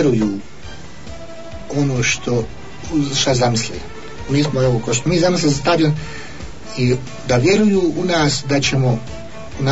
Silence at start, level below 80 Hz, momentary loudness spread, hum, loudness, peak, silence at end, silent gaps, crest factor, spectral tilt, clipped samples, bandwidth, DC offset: 0 s; -40 dBFS; 19 LU; none; -17 LUFS; -4 dBFS; 0 s; none; 14 dB; -5 dB/octave; under 0.1%; 8 kHz; 3%